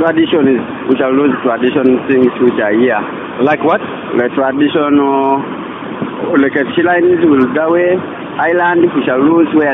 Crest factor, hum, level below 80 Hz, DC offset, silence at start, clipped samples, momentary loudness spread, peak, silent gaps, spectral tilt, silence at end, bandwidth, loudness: 12 dB; none; -56 dBFS; under 0.1%; 0 s; under 0.1%; 7 LU; 0 dBFS; none; -9 dB/octave; 0 s; 3.9 kHz; -12 LUFS